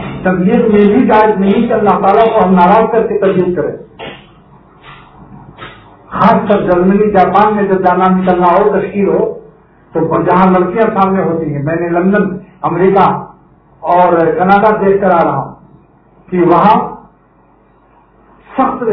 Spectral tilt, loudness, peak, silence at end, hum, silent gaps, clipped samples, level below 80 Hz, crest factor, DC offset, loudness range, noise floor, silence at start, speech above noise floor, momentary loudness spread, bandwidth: -10.5 dB/octave; -10 LUFS; 0 dBFS; 0 s; none; none; 0.4%; -42 dBFS; 10 dB; under 0.1%; 6 LU; -47 dBFS; 0 s; 38 dB; 13 LU; 5.4 kHz